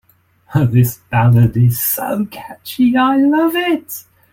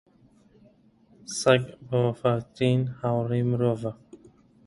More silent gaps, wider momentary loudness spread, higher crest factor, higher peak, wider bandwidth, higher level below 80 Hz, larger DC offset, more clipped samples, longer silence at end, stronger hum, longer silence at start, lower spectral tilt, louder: neither; about the same, 14 LU vs 13 LU; second, 14 dB vs 22 dB; first, -2 dBFS vs -6 dBFS; first, 17 kHz vs 11.5 kHz; first, -46 dBFS vs -60 dBFS; neither; neither; second, 0.3 s vs 0.5 s; neither; second, 0.5 s vs 1.3 s; about the same, -6.5 dB/octave vs -6 dB/octave; first, -14 LUFS vs -26 LUFS